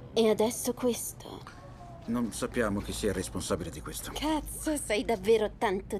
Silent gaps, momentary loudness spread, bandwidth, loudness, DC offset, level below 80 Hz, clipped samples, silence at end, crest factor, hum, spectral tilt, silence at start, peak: none; 18 LU; 15.5 kHz; -31 LUFS; under 0.1%; -48 dBFS; under 0.1%; 0 s; 20 dB; none; -4 dB/octave; 0 s; -12 dBFS